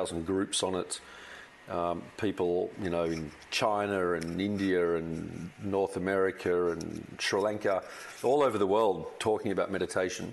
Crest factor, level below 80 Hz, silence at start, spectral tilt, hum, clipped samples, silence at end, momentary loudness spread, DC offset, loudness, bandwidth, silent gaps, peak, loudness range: 16 dB; -62 dBFS; 0 s; -4.5 dB/octave; none; under 0.1%; 0 s; 11 LU; under 0.1%; -31 LUFS; 12 kHz; none; -14 dBFS; 3 LU